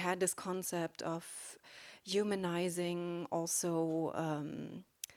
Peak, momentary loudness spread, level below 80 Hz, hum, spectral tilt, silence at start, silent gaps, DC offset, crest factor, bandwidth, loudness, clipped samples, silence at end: -20 dBFS; 14 LU; -78 dBFS; none; -4 dB/octave; 0 s; none; under 0.1%; 18 dB; 19.5 kHz; -38 LUFS; under 0.1%; 0.05 s